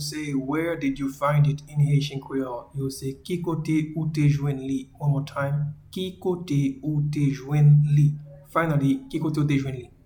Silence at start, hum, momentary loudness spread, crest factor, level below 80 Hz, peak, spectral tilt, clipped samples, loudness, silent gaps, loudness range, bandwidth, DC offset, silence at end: 0 s; none; 10 LU; 16 dB; -52 dBFS; -8 dBFS; -7.5 dB/octave; under 0.1%; -25 LUFS; none; 4 LU; 14 kHz; under 0.1%; 0.2 s